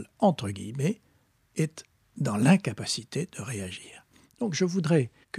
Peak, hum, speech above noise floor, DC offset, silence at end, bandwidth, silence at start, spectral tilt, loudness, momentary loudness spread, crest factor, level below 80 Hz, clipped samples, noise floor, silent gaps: -6 dBFS; none; 39 dB; under 0.1%; 0 s; 14 kHz; 0 s; -5.5 dB/octave; -28 LUFS; 16 LU; 22 dB; -68 dBFS; under 0.1%; -66 dBFS; none